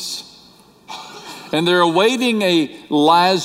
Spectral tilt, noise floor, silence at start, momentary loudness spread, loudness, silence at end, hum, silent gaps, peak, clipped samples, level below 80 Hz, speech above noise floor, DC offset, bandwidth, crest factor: -4 dB/octave; -48 dBFS; 0 s; 21 LU; -16 LUFS; 0 s; none; none; -2 dBFS; under 0.1%; -64 dBFS; 33 dB; under 0.1%; 16 kHz; 16 dB